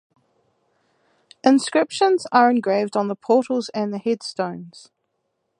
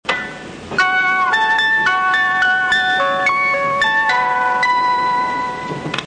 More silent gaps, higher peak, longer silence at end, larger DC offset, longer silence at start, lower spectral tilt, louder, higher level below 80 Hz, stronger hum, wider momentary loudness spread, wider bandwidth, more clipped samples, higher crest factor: neither; first, -2 dBFS vs -6 dBFS; first, 0.8 s vs 0 s; second, under 0.1% vs 0.2%; first, 1.45 s vs 0.05 s; first, -4.5 dB/octave vs -3 dB/octave; second, -20 LUFS vs -15 LUFS; second, -74 dBFS vs -52 dBFS; neither; about the same, 10 LU vs 9 LU; first, 11 kHz vs 9.8 kHz; neither; first, 20 dB vs 10 dB